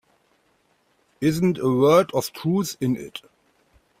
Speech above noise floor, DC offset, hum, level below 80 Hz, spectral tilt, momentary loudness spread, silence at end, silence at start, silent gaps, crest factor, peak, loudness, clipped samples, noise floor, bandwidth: 44 dB; under 0.1%; none; -60 dBFS; -6 dB/octave; 12 LU; 0.8 s; 1.2 s; none; 18 dB; -4 dBFS; -22 LUFS; under 0.1%; -65 dBFS; 16 kHz